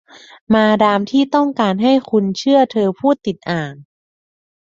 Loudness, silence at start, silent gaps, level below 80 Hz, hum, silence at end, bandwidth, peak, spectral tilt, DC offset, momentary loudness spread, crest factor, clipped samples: -15 LUFS; 0.5 s; none; -56 dBFS; none; 0.9 s; 7.6 kHz; -2 dBFS; -6.5 dB/octave; under 0.1%; 8 LU; 14 dB; under 0.1%